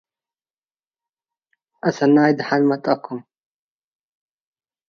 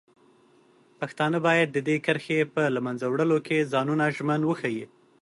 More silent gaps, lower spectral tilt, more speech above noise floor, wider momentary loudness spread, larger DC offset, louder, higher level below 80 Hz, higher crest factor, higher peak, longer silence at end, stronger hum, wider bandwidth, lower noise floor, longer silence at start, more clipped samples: neither; about the same, -7 dB/octave vs -6.5 dB/octave; first, over 72 dB vs 34 dB; first, 13 LU vs 9 LU; neither; first, -18 LUFS vs -25 LUFS; about the same, -72 dBFS vs -72 dBFS; about the same, 20 dB vs 16 dB; first, -4 dBFS vs -10 dBFS; first, 1.7 s vs 0.35 s; neither; second, 6.8 kHz vs 11.5 kHz; first, under -90 dBFS vs -59 dBFS; first, 1.85 s vs 1 s; neither